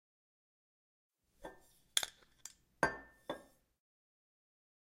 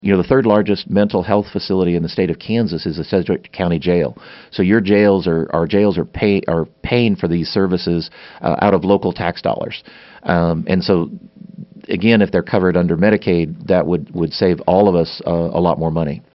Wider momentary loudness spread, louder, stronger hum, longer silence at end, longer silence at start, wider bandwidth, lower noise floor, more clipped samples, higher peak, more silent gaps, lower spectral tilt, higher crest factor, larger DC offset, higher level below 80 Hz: first, 19 LU vs 9 LU; second, -40 LUFS vs -16 LUFS; neither; first, 1.5 s vs 0.15 s; first, 1.4 s vs 0.05 s; first, 16 kHz vs 6 kHz; first, -61 dBFS vs -36 dBFS; neither; second, -10 dBFS vs 0 dBFS; neither; second, -1 dB/octave vs -6 dB/octave; first, 36 dB vs 16 dB; neither; second, -70 dBFS vs -42 dBFS